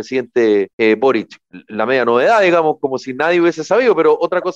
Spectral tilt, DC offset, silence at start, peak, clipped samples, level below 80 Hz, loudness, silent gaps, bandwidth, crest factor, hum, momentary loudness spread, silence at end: -5.5 dB/octave; under 0.1%; 0 s; -4 dBFS; under 0.1%; -66 dBFS; -14 LUFS; 0.73-0.78 s; 8.2 kHz; 12 dB; none; 9 LU; 0 s